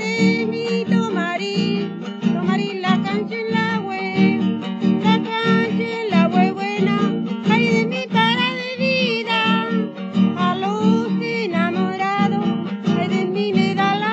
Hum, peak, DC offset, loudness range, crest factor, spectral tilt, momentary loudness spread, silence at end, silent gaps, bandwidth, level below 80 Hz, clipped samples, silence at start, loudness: none; -4 dBFS; under 0.1%; 2 LU; 16 dB; -6.5 dB/octave; 5 LU; 0 s; none; 7.8 kHz; -78 dBFS; under 0.1%; 0 s; -19 LUFS